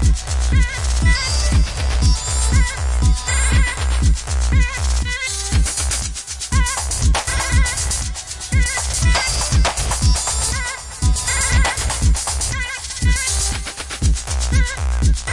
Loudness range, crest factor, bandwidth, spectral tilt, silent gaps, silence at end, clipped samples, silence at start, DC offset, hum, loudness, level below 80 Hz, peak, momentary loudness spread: 2 LU; 14 dB; 11.5 kHz; -3 dB/octave; none; 0 s; under 0.1%; 0 s; 0.3%; none; -18 LUFS; -20 dBFS; -4 dBFS; 5 LU